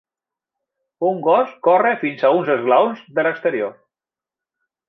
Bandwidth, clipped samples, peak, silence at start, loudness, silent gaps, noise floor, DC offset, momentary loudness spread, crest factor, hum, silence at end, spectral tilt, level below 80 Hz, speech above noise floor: 5.4 kHz; under 0.1%; -2 dBFS; 1 s; -18 LUFS; none; -90 dBFS; under 0.1%; 7 LU; 18 dB; none; 1.15 s; -8 dB/octave; -76 dBFS; 73 dB